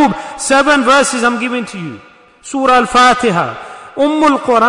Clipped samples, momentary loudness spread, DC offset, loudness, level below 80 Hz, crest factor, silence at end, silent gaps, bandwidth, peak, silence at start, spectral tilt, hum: under 0.1%; 15 LU; under 0.1%; -11 LUFS; -46 dBFS; 12 dB; 0 s; none; 11 kHz; 0 dBFS; 0 s; -3.5 dB/octave; none